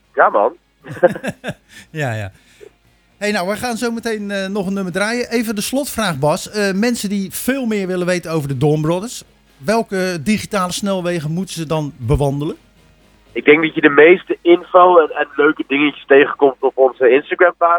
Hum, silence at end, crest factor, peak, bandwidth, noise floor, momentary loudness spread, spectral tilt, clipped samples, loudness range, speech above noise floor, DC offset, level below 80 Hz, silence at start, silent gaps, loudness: none; 0 s; 16 dB; 0 dBFS; over 20 kHz; -50 dBFS; 13 LU; -5.5 dB/octave; under 0.1%; 9 LU; 34 dB; under 0.1%; -42 dBFS; 0.15 s; none; -16 LUFS